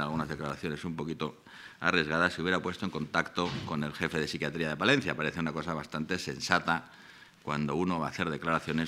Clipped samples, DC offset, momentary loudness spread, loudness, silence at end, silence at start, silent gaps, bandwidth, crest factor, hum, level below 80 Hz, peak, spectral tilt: under 0.1%; under 0.1%; 9 LU; -32 LUFS; 0 s; 0 s; none; 15.5 kHz; 26 dB; none; -60 dBFS; -6 dBFS; -5 dB/octave